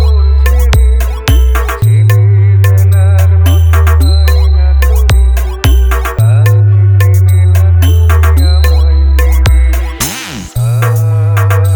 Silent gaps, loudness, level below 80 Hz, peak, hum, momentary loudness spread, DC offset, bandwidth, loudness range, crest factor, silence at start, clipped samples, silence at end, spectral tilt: none; -8 LUFS; -10 dBFS; 0 dBFS; none; 5 LU; under 0.1%; over 20 kHz; 2 LU; 6 dB; 0 s; under 0.1%; 0 s; -5.5 dB/octave